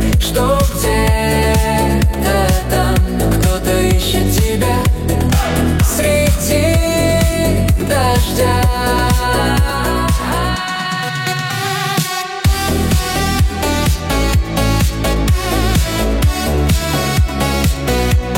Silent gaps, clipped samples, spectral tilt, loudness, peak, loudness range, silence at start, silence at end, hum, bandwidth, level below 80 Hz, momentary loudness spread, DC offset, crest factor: none; under 0.1%; -5 dB/octave; -15 LUFS; -2 dBFS; 3 LU; 0 s; 0 s; none; 16.5 kHz; -18 dBFS; 3 LU; under 0.1%; 12 dB